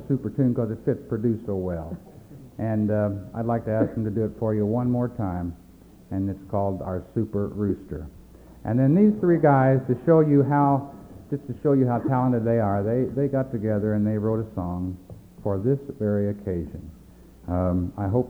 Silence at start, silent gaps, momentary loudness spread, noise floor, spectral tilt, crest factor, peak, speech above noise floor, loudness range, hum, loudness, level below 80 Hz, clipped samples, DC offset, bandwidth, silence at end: 0 s; none; 14 LU; -48 dBFS; -11 dB/octave; 18 dB; -6 dBFS; 25 dB; 7 LU; none; -24 LUFS; -48 dBFS; under 0.1%; under 0.1%; over 20 kHz; 0 s